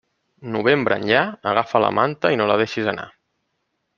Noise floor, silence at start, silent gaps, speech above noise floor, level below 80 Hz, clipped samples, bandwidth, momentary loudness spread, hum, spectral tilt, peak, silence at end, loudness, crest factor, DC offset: -73 dBFS; 0.4 s; none; 54 dB; -60 dBFS; under 0.1%; 7.2 kHz; 11 LU; none; -6 dB/octave; -2 dBFS; 0.9 s; -19 LUFS; 20 dB; under 0.1%